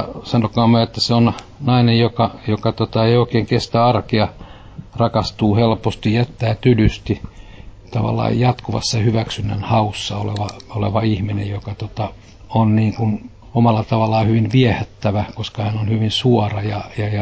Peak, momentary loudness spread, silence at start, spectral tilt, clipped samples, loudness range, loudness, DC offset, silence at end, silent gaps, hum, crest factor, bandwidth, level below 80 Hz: -2 dBFS; 10 LU; 0 s; -7 dB/octave; under 0.1%; 4 LU; -18 LUFS; under 0.1%; 0 s; none; none; 16 dB; 8 kHz; -38 dBFS